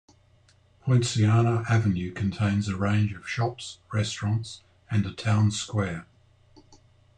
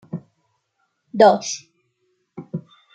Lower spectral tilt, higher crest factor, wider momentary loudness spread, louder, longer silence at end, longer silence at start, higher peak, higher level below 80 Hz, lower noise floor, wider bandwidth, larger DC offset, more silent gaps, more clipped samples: first, -6 dB/octave vs -4.5 dB/octave; about the same, 16 dB vs 20 dB; second, 10 LU vs 21 LU; second, -26 LUFS vs -17 LUFS; about the same, 0.45 s vs 0.35 s; first, 0.85 s vs 0.15 s; second, -10 dBFS vs -2 dBFS; first, -56 dBFS vs -72 dBFS; second, -60 dBFS vs -71 dBFS; about the same, 9.6 kHz vs 9 kHz; neither; neither; neither